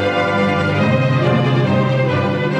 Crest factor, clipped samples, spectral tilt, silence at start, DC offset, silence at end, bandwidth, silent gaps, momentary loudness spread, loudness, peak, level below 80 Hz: 12 dB; under 0.1%; -7.5 dB/octave; 0 s; under 0.1%; 0 s; 8.2 kHz; none; 1 LU; -16 LUFS; -4 dBFS; -52 dBFS